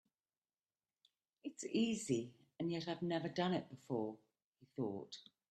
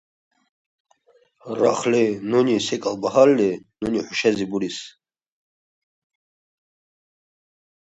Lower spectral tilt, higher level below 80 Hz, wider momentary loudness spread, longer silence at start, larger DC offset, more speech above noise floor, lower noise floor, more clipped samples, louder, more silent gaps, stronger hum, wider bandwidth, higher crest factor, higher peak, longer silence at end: about the same, -5.5 dB/octave vs -5 dB/octave; second, -82 dBFS vs -62 dBFS; first, 16 LU vs 13 LU; about the same, 1.45 s vs 1.45 s; neither; first, over 49 dB vs 40 dB; first, under -90 dBFS vs -60 dBFS; neither; second, -42 LUFS vs -21 LUFS; first, 4.44-4.53 s vs none; neither; first, 12.5 kHz vs 8.2 kHz; about the same, 18 dB vs 22 dB; second, -24 dBFS vs -2 dBFS; second, 0.3 s vs 3.05 s